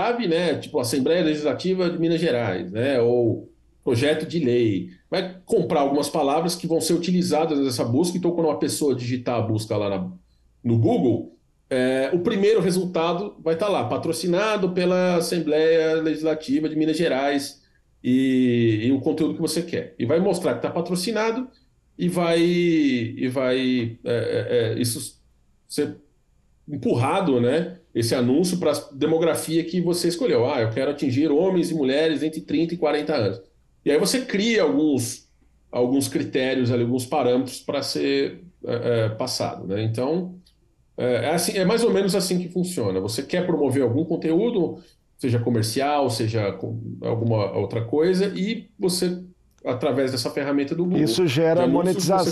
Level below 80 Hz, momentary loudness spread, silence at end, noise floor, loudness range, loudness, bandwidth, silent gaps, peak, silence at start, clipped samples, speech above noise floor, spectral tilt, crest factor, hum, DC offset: -60 dBFS; 8 LU; 0 s; -61 dBFS; 3 LU; -23 LUFS; 13.5 kHz; none; -10 dBFS; 0 s; under 0.1%; 39 dB; -5.5 dB/octave; 12 dB; none; under 0.1%